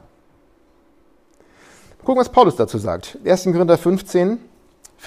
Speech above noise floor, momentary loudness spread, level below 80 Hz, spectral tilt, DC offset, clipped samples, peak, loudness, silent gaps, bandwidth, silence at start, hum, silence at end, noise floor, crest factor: 40 dB; 11 LU; -52 dBFS; -6.5 dB/octave; under 0.1%; under 0.1%; 0 dBFS; -18 LUFS; none; 15 kHz; 2.05 s; none; 0 s; -56 dBFS; 20 dB